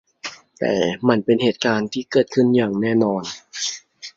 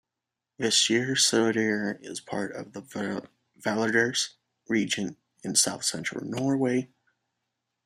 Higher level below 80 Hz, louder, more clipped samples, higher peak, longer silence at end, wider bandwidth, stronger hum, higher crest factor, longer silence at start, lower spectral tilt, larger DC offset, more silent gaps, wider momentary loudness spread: first, -60 dBFS vs -72 dBFS; first, -20 LUFS vs -26 LUFS; neither; first, -2 dBFS vs -8 dBFS; second, 0.1 s vs 1 s; second, 7.8 kHz vs 15 kHz; neither; about the same, 18 dB vs 20 dB; second, 0.25 s vs 0.6 s; first, -5 dB/octave vs -2.5 dB/octave; neither; neither; about the same, 15 LU vs 15 LU